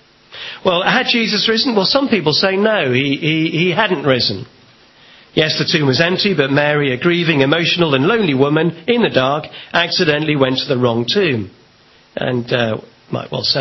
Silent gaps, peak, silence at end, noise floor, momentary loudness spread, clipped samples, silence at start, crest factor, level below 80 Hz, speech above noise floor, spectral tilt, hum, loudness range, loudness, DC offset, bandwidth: none; 0 dBFS; 0 s; -49 dBFS; 8 LU; under 0.1%; 0.3 s; 16 dB; -52 dBFS; 34 dB; -5.5 dB/octave; none; 3 LU; -15 LUFS; under 0.1%; 6.2 kHz